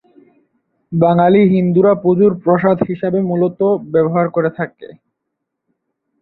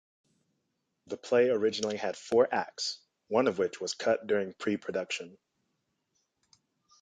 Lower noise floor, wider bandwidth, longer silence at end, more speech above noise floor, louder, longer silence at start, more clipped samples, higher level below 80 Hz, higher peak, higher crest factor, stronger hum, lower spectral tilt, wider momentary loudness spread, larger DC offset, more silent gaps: second, -76 dBFS vs -81 dBFS; second, 4.2 kHz vs 9.4 kHz; second, 1.35 s vs 1.7 s; first, 63 dB vs 51 dB; first, -14 LUFS vs -30 LUFS; second, 0.9 s vs 1.1 s; neither; first, -56 dBFS vs -74 dBFS; first, -2 dBFS vs -12 dBFS; second, 14 dB vs 20 dB; neither; first, -12 dB/octave vs -4 dB/octave; second, 8 LU vs 11 LU; neither; neither